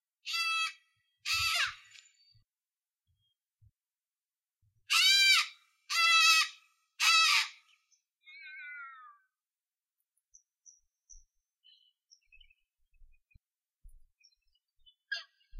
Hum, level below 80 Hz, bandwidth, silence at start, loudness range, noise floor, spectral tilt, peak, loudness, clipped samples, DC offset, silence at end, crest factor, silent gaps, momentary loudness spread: none; -68 dBFS; 16 kHz; 0.25 s; 13 LU; under -90 dBFS; 4.5 dB/octave; -10 dBFS; -26 LUFS; under 0.1%; under 0.1%; 0 s; 24 dB; none; 23 LU